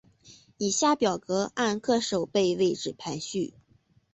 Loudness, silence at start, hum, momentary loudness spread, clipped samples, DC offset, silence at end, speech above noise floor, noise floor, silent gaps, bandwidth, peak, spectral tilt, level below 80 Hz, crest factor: -27 LUFS; 0.25 s; none; 9 LU; under 0.1%; under 0.1%; 0.65 s; 37 dB; -64 dBFS; none; 8.4 kHz; -10 dBFS; -4 dB/octave; -66 dBFS; 18 dB